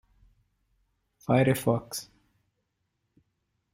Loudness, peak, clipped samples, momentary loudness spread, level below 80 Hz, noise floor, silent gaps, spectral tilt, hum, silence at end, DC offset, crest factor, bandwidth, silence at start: -27 LUFS; -10 dBFS; under 0.1%; 15 LU; -64 dBFS; -79 dBFS; none; -6 dB/octave; none; 1.7 s; under 0.1%; 22 dB; 16 kHz; 1.3 s